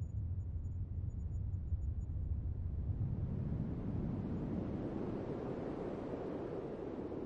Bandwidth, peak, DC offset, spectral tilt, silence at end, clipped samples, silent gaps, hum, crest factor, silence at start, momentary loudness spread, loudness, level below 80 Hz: 7.2 kHz; -28 dBFS; under 0.1%; -10.5 dB/octave; 0 s; under 0.1%; none; none; 12 dB; 0 s; 3 LU; -42 LUFS; -46 dBFS